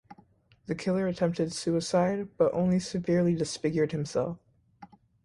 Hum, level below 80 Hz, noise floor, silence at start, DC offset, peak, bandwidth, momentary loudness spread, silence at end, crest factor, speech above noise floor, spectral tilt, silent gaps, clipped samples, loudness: none; -62 dBFS; -61 dBFS; 0.1 s; under 0.1%; -10 dBFS; 11.5 kHz; 7 LU; 0.4 s; 18 dB; 33 dB; -6 dB/octave; none; under 0.1%; -29 LUFS